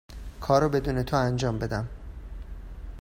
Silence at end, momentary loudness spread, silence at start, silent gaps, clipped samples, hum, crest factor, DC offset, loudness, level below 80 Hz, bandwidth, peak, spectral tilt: 0 s; 20 LU; 0.1 s; none; under 0.1%; none; 20 dB; under 0.1%; -26 LUFS; -40 dBFS; 16 kHz; -8 dBFS; -6.5 dB/octave